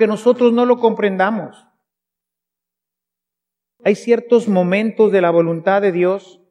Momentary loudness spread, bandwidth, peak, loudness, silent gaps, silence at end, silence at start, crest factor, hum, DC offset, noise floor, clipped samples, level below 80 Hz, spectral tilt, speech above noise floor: 6 LU; 10.5 kHz; 0 dBFS; -16 LUFS; none; 0.3 s; 0 s; 16 dB; none; under 0.1%; -84 dBFS; under 0.1%; -80 dBFS; -7 dB/octave; 69 dB